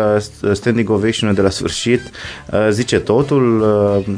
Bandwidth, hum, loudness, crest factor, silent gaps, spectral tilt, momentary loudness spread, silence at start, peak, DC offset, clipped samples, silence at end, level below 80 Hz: 11 kHz; none; -15 LUFS; 14 dB; none; -5.5 dB/octave; 6 LU; 0 s; 0 dBFS; under 0.1%; under 0.1%; 0 s; -42 dBFS